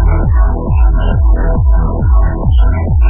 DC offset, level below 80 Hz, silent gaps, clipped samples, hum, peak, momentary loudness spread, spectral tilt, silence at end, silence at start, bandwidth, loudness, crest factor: under 0.1%; -10 dBFS; none; under 0.1%; none; 0 dBFS; 1 LU; -12 dB/octave; 0 s; 0 s; 3.4 kHz; -13 LUFS; 8 dB